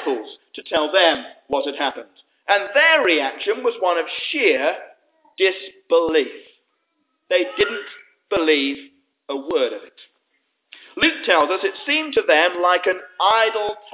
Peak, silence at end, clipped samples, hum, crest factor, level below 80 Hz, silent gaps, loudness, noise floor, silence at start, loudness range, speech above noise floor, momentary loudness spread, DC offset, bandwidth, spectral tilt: -2 dBFS; 0.05 s; under 0.1%; none; 18 dB; -62 dBFS; none; -19 LUFS; -71 dBFS; 0 s; 5 LU; 51 dB; 15 LU; under 0.1%; 4 kHz; -6 dB/octave